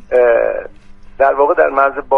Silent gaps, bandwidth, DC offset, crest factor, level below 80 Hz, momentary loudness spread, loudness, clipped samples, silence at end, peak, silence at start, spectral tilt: none; 4.2 kHz; under 0.1%; 14 dB; -42 dBFS; 6 LU; -13 LUFS; under 0.1%; 0 s; 0 dBFS; 0.1 s; -6.5 dB/octave